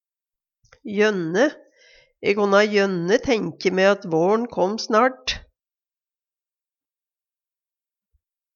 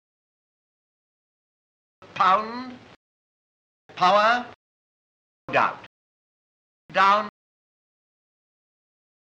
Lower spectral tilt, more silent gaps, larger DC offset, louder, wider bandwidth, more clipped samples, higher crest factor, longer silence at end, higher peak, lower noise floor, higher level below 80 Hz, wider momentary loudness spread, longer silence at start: about the same, -5 dB/octave vs -4 dB/octave; second, none vs 2.96-3.89 s, 4.55-5.48 s, 5.86-6.89 s; neither; about the same, -20 LUFS vs -21 LUFS; second, 7.2 kHz vs 8.8 kHz; neither; about the same, 22 dB vs 20 dB; first, 3.15 s vs 2.05 s; first, -2 dBFS vs -8 dBFS; about the same, under -90 dBFS vs under -90 dBFS; first, -54 dBFS vs -72 dBFS; second, 10 LU vs 22 LU; second, 0.85 s vs 2.15 s